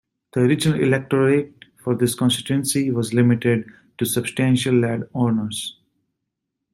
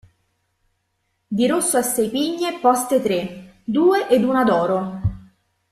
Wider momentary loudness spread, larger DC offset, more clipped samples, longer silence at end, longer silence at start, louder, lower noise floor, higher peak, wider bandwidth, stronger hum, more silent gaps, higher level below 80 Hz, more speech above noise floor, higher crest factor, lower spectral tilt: about the same, 10 LU vs 10 LU; neither; neither; first, 1 s vs 0.5 s; second, 0.35 s vs 1.3 s; about the same, -20 LUFS vs -19 LUFS; first, -80 dBFS vs -71 dBFS; about the same, -6 dBFS vs -4 dBFS; first, 16 kHz vs 14 kHz; neither; neither; second, -58 dBFS vs -48 dBFS; first, 60 dB vs 53 dB; about the same, 16 dB vs 18 dB; about the same, -5.5 dB/octave vs -4.5 dB/octave